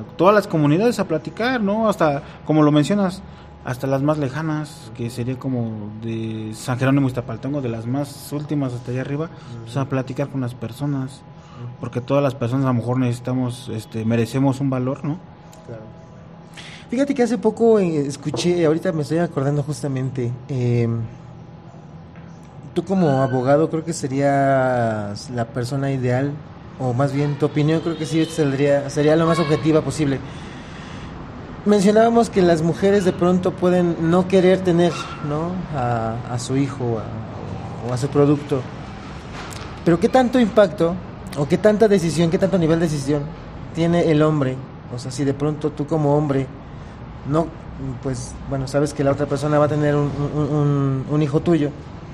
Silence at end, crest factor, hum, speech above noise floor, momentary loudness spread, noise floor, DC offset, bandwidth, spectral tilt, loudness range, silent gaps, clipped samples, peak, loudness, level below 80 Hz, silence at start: 0 s; 20 dB; none; 21 dB; 17 LU; -40 dBFS; under 0.1%; 14 kHz; -7 dB/octave; 7 LU; none; under 0.1%; 0 dBFS; -20 LUFS; -46 dBFS; 0 s